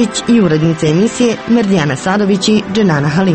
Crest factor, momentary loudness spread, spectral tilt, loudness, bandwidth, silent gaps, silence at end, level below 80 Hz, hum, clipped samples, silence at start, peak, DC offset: 10 dB; 2 LU; -5.5 dB/octave; -12 LUFS; 8.8 kHz; none; 0 s; -44 dBFS; none; under 0.1%; 0 s; 0 dBFS; under 0.1%